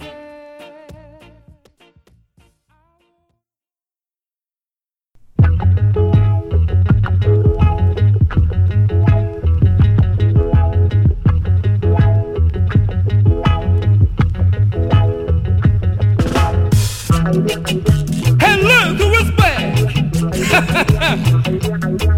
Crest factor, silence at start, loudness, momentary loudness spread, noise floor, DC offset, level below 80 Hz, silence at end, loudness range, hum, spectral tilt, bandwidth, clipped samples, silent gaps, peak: 14 dB; 0 s; -14 LUFS; 4 LU; under -90 dBFS; under 0.1%; -24 dBFS; 0 s; 3 LU; none; -6.5 dB/octave; 15.5 kHz; under 0.1%; none; 0 dBFS